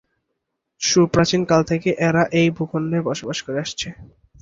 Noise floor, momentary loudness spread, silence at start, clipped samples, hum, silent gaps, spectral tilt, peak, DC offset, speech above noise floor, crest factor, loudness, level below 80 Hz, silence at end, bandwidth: -77 dBFS; 10 LU; 0.8 s; under 0.1%; none; none; -5 dB/octave; -2 dBFS; under 0.1%; 57 dB; 18 dB; -20 LUFS; -50 dBFS; 0.35 s; 7.8 kHz